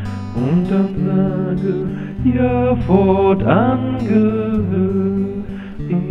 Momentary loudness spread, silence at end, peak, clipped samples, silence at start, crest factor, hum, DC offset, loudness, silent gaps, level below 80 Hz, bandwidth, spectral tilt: 9 LU; 0 s; 0 dBFS; under 0.1%; 0 s; 16 dB; none; under 0.1%; -17 LUFS; none; -34 dBFS; 5.8 kHz; -10 dB/octave